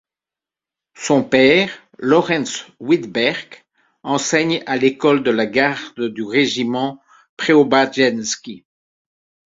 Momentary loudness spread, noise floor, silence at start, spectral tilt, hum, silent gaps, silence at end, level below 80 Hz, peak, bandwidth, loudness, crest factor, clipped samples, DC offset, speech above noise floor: 13 LU; -89 dBFS; 1 s; -4 dB/octave; none; 7.29-7.37 s; 0.95 s; -60 dBFS; 0 dBFS; 7.8 kHz; -17 LUFS; 18 dB; under 0.1%; under 0.1%; 72 dB